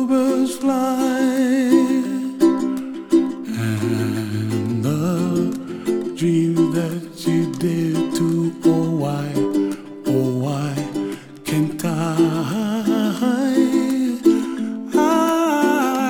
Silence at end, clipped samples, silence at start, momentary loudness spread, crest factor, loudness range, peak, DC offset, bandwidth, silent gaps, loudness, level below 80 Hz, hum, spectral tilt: 0 s; under 0.1%; 0 s; 7 LU; 16 dB; 3 LU; -4 dBFS; under 0.1%; 18.5 kHz; none; -20 LUFS; -62 dBFS; none; -6.5 dB/octave